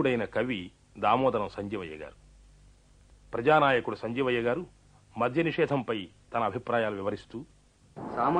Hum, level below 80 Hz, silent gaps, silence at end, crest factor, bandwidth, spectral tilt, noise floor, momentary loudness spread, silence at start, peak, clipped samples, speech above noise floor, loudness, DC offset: none; -58 dBFS; none; 0 s; 20 dB; 10 kHz; -7 dB/octave; -58 dBFS; 19 LU; 0 s; -10 dBFS; under 0.1%; 30 dB; -29 LUFS; under 0.1%